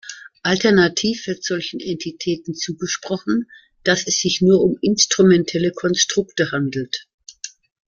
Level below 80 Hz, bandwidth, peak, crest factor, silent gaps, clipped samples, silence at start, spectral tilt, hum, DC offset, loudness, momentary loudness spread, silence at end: -56 dBFS; 7.4 kHz; 0 dBFS; 18 dB; 7.14-7.18 s; under 0.1%; 0.05 s; -4 dB/octave; none; under 0.1%; -19 LUFS; 13 LU; 0.4 s